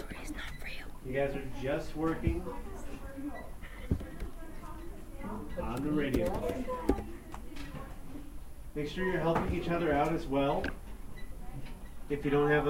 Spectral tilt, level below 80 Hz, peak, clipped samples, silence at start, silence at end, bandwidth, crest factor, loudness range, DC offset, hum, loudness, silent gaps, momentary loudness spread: -6.5 dB/octave; -42 dBFS; -12 dBFS; under 0.1%; 0 s; 0 s; 16 kHz; 22 dB; 6 LU; under 0.1%; none; -35 LUFS; none; 17 LU